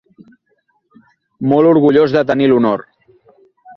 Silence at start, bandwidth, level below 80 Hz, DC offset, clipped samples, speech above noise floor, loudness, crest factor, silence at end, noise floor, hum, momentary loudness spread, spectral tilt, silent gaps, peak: 1.4 s; 6.2 kHz; -56 dBFS; under 0.1%; under 0.1%; 52 dB; -13 LUFS; 14 dB; 0.05 s; -63 dBFS; none; 9 LU; -9 dB/octave; none; -2 dBFS